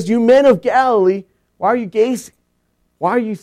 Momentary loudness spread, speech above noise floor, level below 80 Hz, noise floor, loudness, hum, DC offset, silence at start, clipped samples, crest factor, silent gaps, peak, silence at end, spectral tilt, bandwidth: 11 LU; 50 dB; -58 dBFS; -64 dBFS; -15 LUFS; none; under 0.1%; 0 s; under 0.1%; 14 dB; none; -2 dBFS; 0.05 s; -6 dB/octave; 13.5 kHz